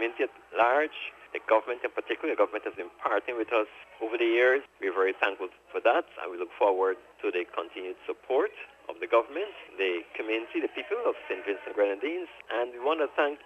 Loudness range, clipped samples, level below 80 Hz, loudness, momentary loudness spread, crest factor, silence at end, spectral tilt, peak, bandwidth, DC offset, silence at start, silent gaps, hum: 4 LU; under 0.1%; -74 dBFS; -29 LUFS; 12 LU; 20 dB; 0.1 s; -4 dB/octave; -10 dBFS; 8.4 kHz; under 0.1%; 0 s; none; none